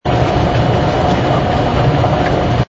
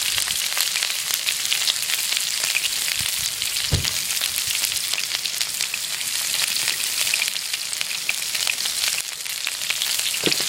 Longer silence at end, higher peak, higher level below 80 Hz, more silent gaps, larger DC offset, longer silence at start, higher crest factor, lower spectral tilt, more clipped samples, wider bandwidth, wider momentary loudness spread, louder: about the same, 0.05 s vs 0 s; about the same, 0 dBFS vs 0 dBFS; first, -26 dBFS vs -50 dBFS; neither; neither; about the same, 0.05 s vs 0 s; second, 12 dB vs 24 dB; first, -7 dB/octave vs 0.5 dB/octave; neither; second, 7.8 kHz vs 17 kHz; second, 1 LU vs 4 LU; first, -14 LUFS vs -21 LUFS